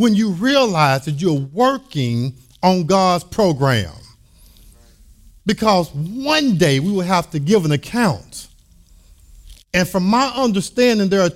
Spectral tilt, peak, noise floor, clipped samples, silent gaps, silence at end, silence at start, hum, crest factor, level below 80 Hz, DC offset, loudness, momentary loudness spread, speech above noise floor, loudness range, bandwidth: -5.5 dB/octave; -2 dBFS; -48 dBFS; under 0.1%; none; 0 s; 0 s; none; 16 dB; -46 dBFS; under 0.1%; -17 LUFS; 8 LU; 32 dB; 3 LU; 16 kHz